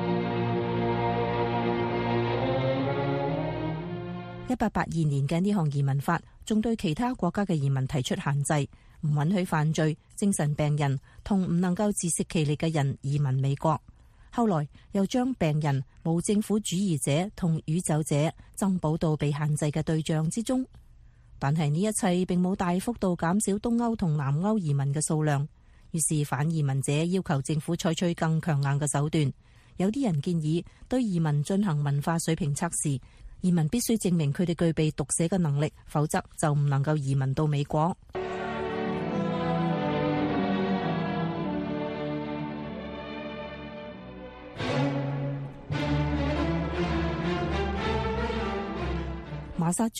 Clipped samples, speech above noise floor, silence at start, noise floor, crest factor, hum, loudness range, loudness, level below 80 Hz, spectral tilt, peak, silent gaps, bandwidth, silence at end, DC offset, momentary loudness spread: under 0.1%; 27 dB; 0 s; -53 dBFS; 16 dB; none; 3 LU; -28 LUFS; -46 dBFS; -6 dB/octave; -12 dBFS; none; 14.5 kHz; 0 s; under 0.1%; 7 LU